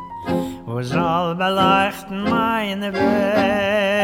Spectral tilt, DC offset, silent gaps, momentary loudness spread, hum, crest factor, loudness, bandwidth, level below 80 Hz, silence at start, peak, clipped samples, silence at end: -6 dB/octave; under 0.1%; none; 9 LU; none; 16 dB; -19 LUFS; 17 kHz; -48 dBFS; 0 s; -4 dBFS; under 0.1%; 0 s